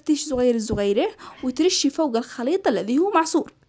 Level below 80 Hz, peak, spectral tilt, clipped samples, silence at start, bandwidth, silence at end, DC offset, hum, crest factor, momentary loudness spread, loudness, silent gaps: -50 dBFS; -8 dBFS; -4 dB/octave; under 0.1%; 0.05 s; 8 kHz; 0.25 s; under 0.1%; none; 14 dB; 6 LU; -22 LUFS; none